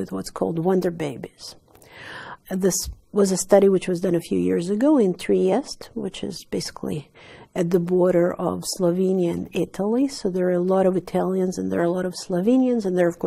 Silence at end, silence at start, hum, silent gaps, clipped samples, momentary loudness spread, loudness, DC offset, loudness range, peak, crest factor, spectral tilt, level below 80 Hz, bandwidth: 0 s; 0 s; none; none; under 0.1%; 13 LU; -22 LUFS; under 0.1%; 4 LU; -2 dBFS; 20 dB; -6 dB/octave; -52 dBFS; 15.5 kHz